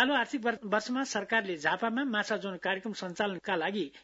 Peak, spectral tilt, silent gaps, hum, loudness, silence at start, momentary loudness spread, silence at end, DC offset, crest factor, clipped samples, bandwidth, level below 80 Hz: -12 dBFS; -2 dB/octave; none; none; -31 LUFS; 0 s; 4 LU; 0.05 s; under 0.1%; 20 dB; under 0.1%; 7.6 kHz; -74 dBFS